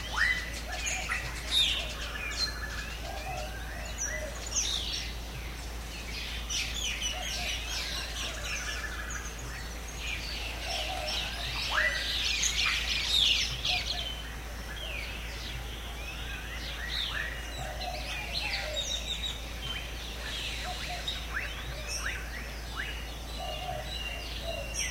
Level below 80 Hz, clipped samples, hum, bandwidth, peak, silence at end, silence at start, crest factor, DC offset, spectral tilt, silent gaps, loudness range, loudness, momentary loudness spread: -40 dBFS; under 0.1%; none; 16 kHz; -14 dBFS; 0 s; 0 s; 20 dB; under 0.1%; -1.5 dB/octave; none; 8 LU; -32 LUFS; 12 LU